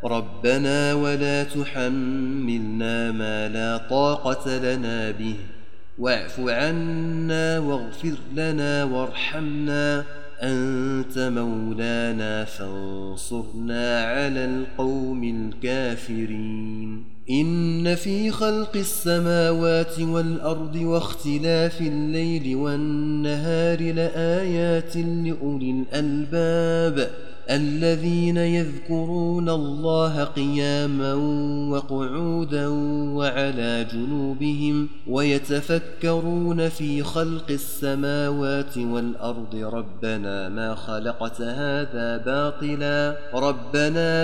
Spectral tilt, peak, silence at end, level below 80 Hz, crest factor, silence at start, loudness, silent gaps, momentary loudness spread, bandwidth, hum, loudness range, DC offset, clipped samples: -6 dB/octave; -8 dBFS; 0 s; -52 dBFS; 16 dB; 0 s; -24 LUFS; none; 8 LU; 16 kHz; none; 4 LU; 4%; under 0.1%